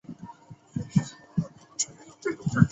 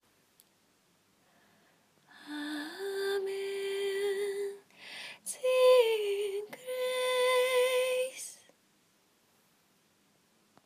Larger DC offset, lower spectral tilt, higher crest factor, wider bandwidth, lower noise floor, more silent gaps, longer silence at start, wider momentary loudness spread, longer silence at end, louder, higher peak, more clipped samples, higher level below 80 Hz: neither; first, -5.5 dB/octave vs -1 dB/octave; first, 26 dB vs 20 dB; second, 8.2 kHz vs 15.5 kHz; second, -49 dBFS vs -70 dBFS; neither; second, 0.1 s vs 2.2 s; about the same, 17 LU vs 17 LU; second, 0 s vs 2.3 s; about the same, -31 LUFS vs -31 LUFS; first, -4 dBFS vs -14 dBFS; neither; first, -52 dBFS vs under -90 dBFS